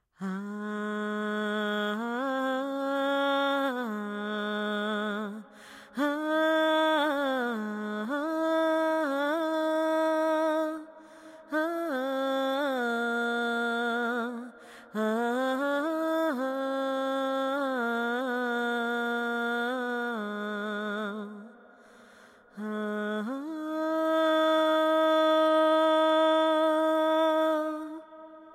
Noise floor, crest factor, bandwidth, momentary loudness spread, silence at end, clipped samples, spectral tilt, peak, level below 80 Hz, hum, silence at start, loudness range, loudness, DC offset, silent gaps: -55 dBFS; 14 dB; 15.5 kHz; 12 LU; 0 s; under 0.1%; -5 dB/octave; -14 dBFS; -84 dBFS; none; 0.2 s; 8 LU; -28 LUFS; under 0.1%; none